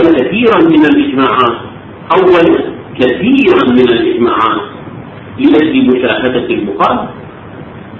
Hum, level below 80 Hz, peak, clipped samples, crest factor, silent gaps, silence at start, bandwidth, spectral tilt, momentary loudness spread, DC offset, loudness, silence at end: none; -42 dBFS; 0 dBFS; 0.5%; 10 dB; none; 0 s; 6.4 kHz; -7.5 dB/octave; 21 LU; under 0.1%; -9 LUFS; 0 s